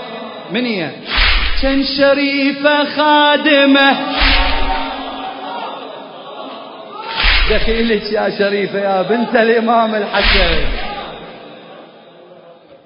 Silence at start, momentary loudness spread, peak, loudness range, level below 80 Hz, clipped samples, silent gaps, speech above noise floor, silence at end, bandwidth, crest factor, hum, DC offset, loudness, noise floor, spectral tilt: 0 s; 19 LU; 0 dBFS; 7 LU; -24 dBFS; under 0.1%; none; 28 dB; 0.1 s; 5.4 kHz; 14 dB; none; under 0.1%; -14 LUFS; -41 dBFS; -8 dB/octave